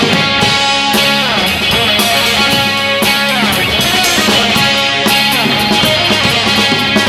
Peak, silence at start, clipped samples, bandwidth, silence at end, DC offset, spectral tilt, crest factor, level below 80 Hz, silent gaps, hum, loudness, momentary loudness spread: 0 dBFS; 0 s; under 0.1%; 19 kHz; 0 s; under 0.1%; -2.5 dB/octave; 12 dB; -36 dBFS; none; none; -9 LUFS; 2 LU